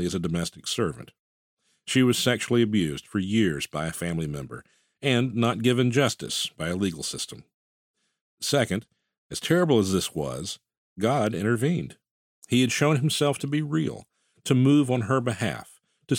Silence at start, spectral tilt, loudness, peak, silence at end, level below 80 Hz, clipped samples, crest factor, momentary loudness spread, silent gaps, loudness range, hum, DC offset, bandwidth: 0 s; -5 dB/octave; -25 LUFS; -6 dBFS; 0 s; -56 dBFS; under 0.1%; 20 dB; 12 LU; 1.19-1.57 s, 7.54-7.94 s, 8.21-8.38 s, 9.18-9.30 s, 10.77-10.96 s, 12.11-12.42 s; 3 LU; none; under 0.1%; 17 kHz